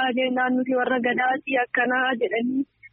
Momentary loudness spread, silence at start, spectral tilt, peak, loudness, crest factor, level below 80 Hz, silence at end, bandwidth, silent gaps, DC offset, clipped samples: 3 LU; 0 s; -1.5 dB/octave; -10 dBFS; -23 LUFS; 14 dB; -72 dBFS; 0.05 s; 3.7 kHz; none; under 0.1%; under 0.1%